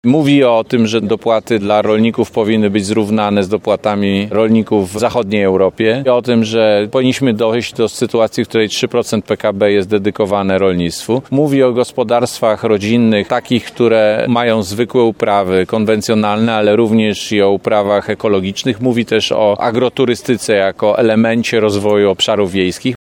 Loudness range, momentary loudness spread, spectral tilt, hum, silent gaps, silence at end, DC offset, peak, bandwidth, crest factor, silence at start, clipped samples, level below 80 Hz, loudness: 1 LU; 4 LU; -5.5 dB/octave; none; none; 0.05 s; under 0.1%; 0 dBFS; 16.5 kHz; 12 dB; 0.05 s; under 0.1%; -52 dBFS; -13 LUFS